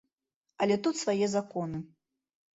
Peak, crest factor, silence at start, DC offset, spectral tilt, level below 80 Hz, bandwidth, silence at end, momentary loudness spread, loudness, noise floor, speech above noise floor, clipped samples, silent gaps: -16 dBFS; 18 dB; 0.6 s; under 0.1%; -5 dB/octave; -70 dBFS; 8 kHz; 0.7 s; 12 LU; -30 LUFS; -85 dBFS; 55 dB; under 0.1%; none